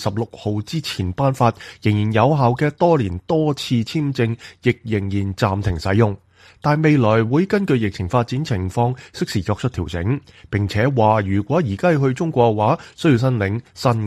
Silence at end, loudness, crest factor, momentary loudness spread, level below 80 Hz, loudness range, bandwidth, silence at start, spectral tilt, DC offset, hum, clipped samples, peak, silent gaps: 0 s; -19 LUFS; 16 dB; 8 LU; -44 dBFS; 3 LU; 13.5 kHz; 0 s; -7 dB/octave; under 0.1%; none; under 0.1%; -2 dBFS; none